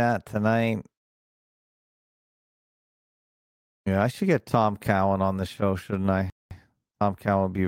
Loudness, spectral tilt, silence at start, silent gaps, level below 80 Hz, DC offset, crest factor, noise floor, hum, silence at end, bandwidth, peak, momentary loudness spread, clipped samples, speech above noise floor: -26 LUFS; -7.5 dB/octave; 0 s; 0.97-3.84 s, 6.32-6.49 s; -58 dBFS; under 0.1%; 20 dB; -48 dBFS; none; 0 s; 16 kHz; -8 dBFS; 5 LU; under 0.1%; 24 dB